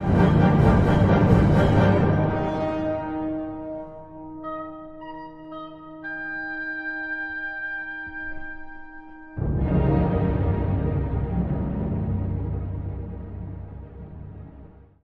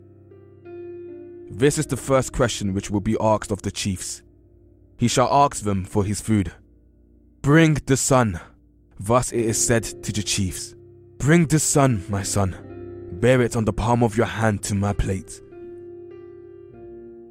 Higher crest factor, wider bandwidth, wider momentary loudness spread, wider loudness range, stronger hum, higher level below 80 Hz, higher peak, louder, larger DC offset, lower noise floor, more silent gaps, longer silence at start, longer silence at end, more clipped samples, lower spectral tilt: about the same, 20 dB vs 20 dB; second, 7.6 kHz vs 16.5 kHz; about the same, 22 LU vs 22 LU; first, 12 LU vs 4 LU; neither; first, -34 dBFS vs -40 dBFS; about the same, -4 dBFS vs -2 dBFS; about the same, -23 LUFS vs -21 LUFS; neither; second, -46 dBFS vs -53 dBFS; neither; second, 0 s vs 0.65 s; first, 0.3 s vs 0 s; neither; first, -9 dB/octave vs -5 dB/octave